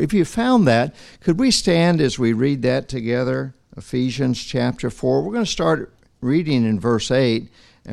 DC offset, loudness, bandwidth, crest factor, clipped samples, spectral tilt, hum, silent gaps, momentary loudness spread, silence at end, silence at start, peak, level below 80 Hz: under 0.1%; -19 LUFS; 12.5 kHz; 16 dB; under 0.1%; -5.5 dB/octave; none; none; 9 LU; 0 s; 0 s; -4 dBFS; -44 dBFS